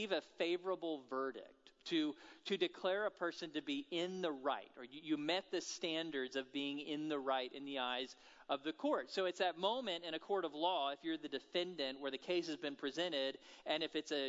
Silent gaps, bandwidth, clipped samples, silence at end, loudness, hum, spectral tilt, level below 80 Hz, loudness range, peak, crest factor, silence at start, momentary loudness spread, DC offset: none; 7.6 kHz; under 0.1%; 0 s; -41 LUFS; none; -1.5 dB/octave; -86 dBFS; 2 LU; -22 dBFS; 20 dB; 0 s; 6 LU; under 0.1%